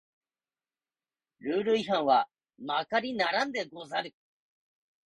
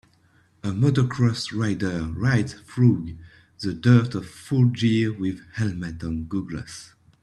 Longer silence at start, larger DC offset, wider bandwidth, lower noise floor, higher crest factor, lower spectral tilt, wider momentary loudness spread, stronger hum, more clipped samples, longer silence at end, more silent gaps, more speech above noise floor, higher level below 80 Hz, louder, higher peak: first, 1.45 s vs 0.65 s; neither; about the same, 11 kHz vs 11.5 kHz; first, under -90 dBFS vs -60 dBFS; about the same, 20 dB vs 20 dB; second, -4.5 dB/octave vs -7 dB/octave; about the same, 13 LU vs 14 LU; neither; neither; first, 1.05 s vs 0.4 s; neither; first, over 61 dB vs 37 dB; second, -76 dBFS vs -50 dBFS; second, -29 LUFS vs -24 LUFS; second, -12 dBFS vs -4 dBFS